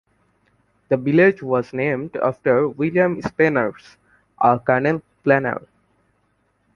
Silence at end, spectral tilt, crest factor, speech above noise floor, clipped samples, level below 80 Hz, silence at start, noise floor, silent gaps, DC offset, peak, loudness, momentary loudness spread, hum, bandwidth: 1.15 s; -8.5 dB/octave; 18 dB; 47 dB; under 0.1%; -58 dBFS; 0.9 s; -66 dBFS; none; under 0.1%; -2 dBFS; -19 LUFS; 8 LU; none; 7 kHz